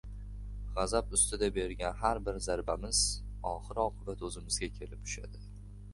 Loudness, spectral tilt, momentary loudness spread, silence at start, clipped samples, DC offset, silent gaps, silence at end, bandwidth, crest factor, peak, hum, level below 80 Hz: -34 LUFS; -3 dB/octave; 17 LU; 0.05 s; under 0.1%; under 0.1%; none; 0 s; 11.5 kHz; 22 dB; -14 dBFS; 50 Hz at -45 dBFS; -44 dBFS